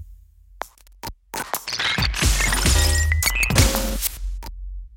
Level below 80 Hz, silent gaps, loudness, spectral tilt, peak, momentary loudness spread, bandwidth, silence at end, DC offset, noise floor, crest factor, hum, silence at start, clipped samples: -26 dBFS; none; -20 LUFS; -3 dB/octave; -2 dBFS; 20 LU; 17 kHz; 0 s; under 0.1%; -47 dBFS; 20 dB; none; 0 s; under 0.1%